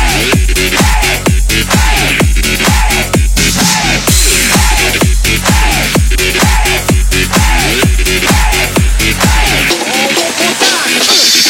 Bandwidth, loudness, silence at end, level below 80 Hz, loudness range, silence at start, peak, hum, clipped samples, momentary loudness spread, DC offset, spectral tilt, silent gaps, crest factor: 17 kHz; -9 LUFS; 0 s; -14 dBFS; 1 LU; 0 s; 0 dBFS; none; 0.3%; 3 LU; under 0.1%; -3 dB/octave; none; 8 dB